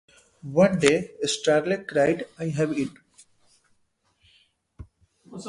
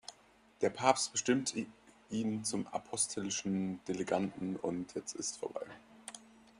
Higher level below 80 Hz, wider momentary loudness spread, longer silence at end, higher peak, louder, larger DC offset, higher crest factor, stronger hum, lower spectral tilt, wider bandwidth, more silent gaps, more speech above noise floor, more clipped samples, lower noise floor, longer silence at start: first, -58 dBFS vs -74 dBFS; second, 11 LU vs 18 LU; second, 0 s vs 0.35 s; first, -2 dBFS vs -12 dBFS; first, -24 LUFS vs -36 LUFS; neither; about the same, 26 dB vs 26 dB; neither; first, -5 dB/octave vs -3.5 dB/octave; about the same, 11.5 kHz vs 11.5 kHz; neither; first, 46 dB vs 29 dB; neither; first, -69 dBFS vs -64 dBFS; first, 0.45 s vs 0.1 s